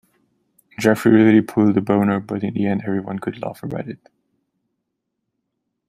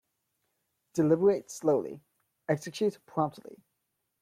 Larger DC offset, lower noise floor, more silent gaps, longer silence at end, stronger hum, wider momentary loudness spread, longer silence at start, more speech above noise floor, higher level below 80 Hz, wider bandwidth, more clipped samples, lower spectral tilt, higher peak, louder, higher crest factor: neither; second, -77 dBFS vs -81 dBFS; neither; first, 1.95 s vs 0.65 s; neither; second, 16 LU vs 19 LU; second, 0.8 s vs 0.95 s; first, 59 dB vs 52 dB; first, -60 dBFS vs -76 dBFS; about the same, 14.5 kHz vs 15 kHz; neither; about the same, -7.5 dB/octave vs -6.5 dB/octave; first, -2 dBFS vs -14 dBFS; first, -18 LUFS vs -29 LUFS; about the same, 18 dB vs 18 dB